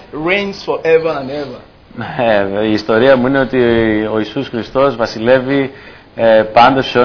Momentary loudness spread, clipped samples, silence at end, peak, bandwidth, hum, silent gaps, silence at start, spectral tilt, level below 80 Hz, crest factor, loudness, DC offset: 12 LU; under 0.1%; 0 s; 0 dBFS; 5.4 kHz; none; none; 0 s; -6.5 dB/octave; -42 dBFS; 14 dB; -13 LUFS; under 0.1%